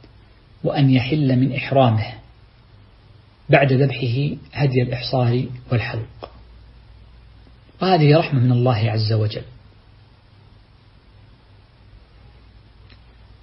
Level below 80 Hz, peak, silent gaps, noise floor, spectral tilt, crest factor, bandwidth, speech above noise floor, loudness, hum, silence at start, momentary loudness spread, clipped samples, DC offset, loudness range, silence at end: -48 dBFS; -2 dBFS; none; -50 dBFS; -11 dB/octave; 20 dB; 5.8 kHz; 32 dB; -19 LUFS; none; 0.65 s; 13 LU; under 0.1%; under 0.1%; 5 LU; 3.9 s